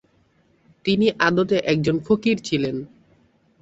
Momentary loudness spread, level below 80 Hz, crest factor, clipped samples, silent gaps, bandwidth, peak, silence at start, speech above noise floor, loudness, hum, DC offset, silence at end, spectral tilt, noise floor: 10 LU; -56 dBFS; 18 dB; under 0.1%; none; 8 kHz; -4 dBFS; 0.85 s; 41 dB; -21 LUFS; none; under 0.1%; 0.75 s; -6 dB/octave; -61 dBFS